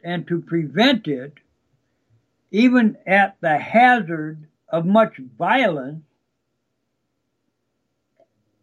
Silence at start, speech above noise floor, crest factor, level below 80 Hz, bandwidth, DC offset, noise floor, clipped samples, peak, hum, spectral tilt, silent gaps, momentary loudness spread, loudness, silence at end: 0.05 s; 56 dB; 18 dB; -74 dBFS; 10 kHz; under 0.1%; -74 dBFS; under 0.1%; -4 dBFS; 60 Hz at -55 dBFS; -6.5 dB/octave; none; 14 LU; -19 LUFS; 2.65 s